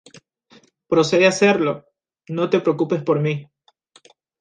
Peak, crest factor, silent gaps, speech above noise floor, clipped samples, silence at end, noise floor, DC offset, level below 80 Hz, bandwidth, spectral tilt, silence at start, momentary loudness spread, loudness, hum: -2 dBFS; 18 dB; none; 38 dB; under 0.1%; 0.95 s; -56 dBFS; under 0.1%; -64 dBFS; 9.8 kHz; -5.5 dB/octave; 0.9 s; 13 LU; -19 LUFS; none